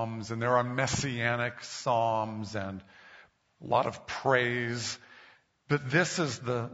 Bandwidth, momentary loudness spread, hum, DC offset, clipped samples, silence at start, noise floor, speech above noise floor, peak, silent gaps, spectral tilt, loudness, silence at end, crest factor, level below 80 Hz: 8 kHz; 10 LU; none; under 0.1%; under 0.1%; 0 s; -59 dBFS; 29 dB; -10 dBFS; none; -4 dB/octave; -30 LUFS; 0 s; 22 dB; -62 dBFS